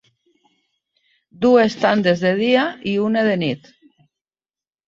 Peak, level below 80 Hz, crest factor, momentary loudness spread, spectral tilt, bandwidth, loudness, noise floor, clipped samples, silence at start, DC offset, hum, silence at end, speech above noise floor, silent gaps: -2 dBFS; -62 dBFS; 18 dB; 7 LU; -6.5 dB/octave; 7.6 kHz; -17 LUFS; under -90 dBFS; under 0.1%; 1.4 s; under 0.1%; none; 1.3 s; over 73 dB; none